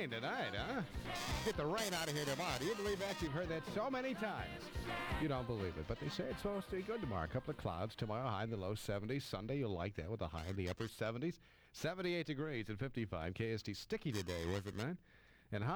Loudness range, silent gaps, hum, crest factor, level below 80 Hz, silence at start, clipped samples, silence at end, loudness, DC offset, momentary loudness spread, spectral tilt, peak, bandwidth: 3 LU; none; none; 18 dB; -56 dBFS; 0 s; under 0.1%; 0 s; -42 LUFS; under 0.1%; 5 LU; -5 dB/octave; -24 dBFS; over 20 kHz